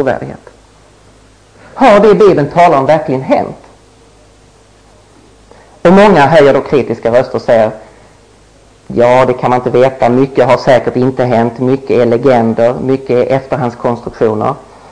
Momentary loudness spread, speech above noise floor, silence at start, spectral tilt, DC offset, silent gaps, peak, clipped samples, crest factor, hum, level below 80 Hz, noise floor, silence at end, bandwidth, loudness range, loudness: 10 LU; 34 dB; 0 s; -7 dB/octave; under 0.1%; none; 0 dBFS; under 0.1%; 10 dB; none; -40 dBFS; -43 dBFS; 0.3 s; 10 kHz; 3 LU; -9 LUFS